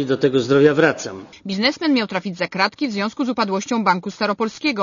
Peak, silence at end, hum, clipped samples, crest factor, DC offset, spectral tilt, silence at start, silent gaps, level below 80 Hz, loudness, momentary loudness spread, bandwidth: -2 dBFS; 0 s; none; under 0.1%; 18 dB; under 0.1%; -5 dB/octave; 0 s; none; -60 dBFS; -19 LUFS; 10 LU; 7.4 kHz